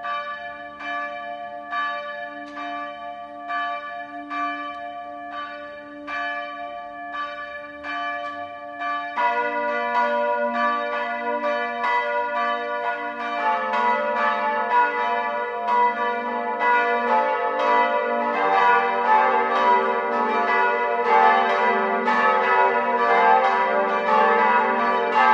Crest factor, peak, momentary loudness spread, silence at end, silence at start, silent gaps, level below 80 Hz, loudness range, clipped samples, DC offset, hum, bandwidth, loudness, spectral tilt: 18 dB; -4 dBFS; 15 LU; 0 s; 0 s; none; -70 dBFS; 12 LU; under 0.1%; under 0.1%; none; 8 kHz; -21 LUFS; -4 dB/octave